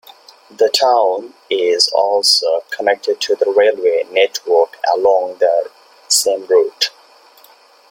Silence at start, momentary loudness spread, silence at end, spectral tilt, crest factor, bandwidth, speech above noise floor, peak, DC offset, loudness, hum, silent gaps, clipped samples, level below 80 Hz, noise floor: 0.6 s; 7 LU; 1 s; 0.5 dB/octave; 16 dB; 16.5 kHz; 32 dB; 0 dBFS; under 0.1%; -15 LUFS; none; none; under 0.1%; -68 dBFS; -47 dBFS